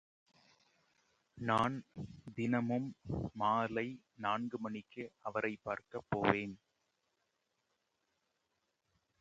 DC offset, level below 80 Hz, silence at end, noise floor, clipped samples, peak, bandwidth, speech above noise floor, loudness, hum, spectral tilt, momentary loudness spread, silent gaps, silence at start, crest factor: under 0.1%; -66 dBFS; 2.65 s; -84 dBFS; under 0.1%; -12 dBFS; 8.8 kHz; 46 dB; -38 LUFS; none; -7 dB/octave; 13 LU; none; 1.35 s; 28 dB